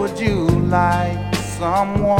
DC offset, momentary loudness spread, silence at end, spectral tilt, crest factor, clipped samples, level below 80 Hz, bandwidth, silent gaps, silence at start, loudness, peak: under 0.1%; 5 LU; 0 s; -6.5 dB/octave; 16 dB; under 0.1%; -32 dBFS; 17 kHz; none; 0 s; -18 LUFS; -2 dBFS